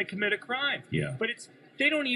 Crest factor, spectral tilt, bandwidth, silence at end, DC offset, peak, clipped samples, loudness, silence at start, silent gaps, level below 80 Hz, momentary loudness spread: 18 dB; -5 dB/octave; 12 kHz; 0 s; under 0.1%; -12 dBFS; under 0.1%; -29 LUFS; 0 s; none; -64 dBFS; 9 LU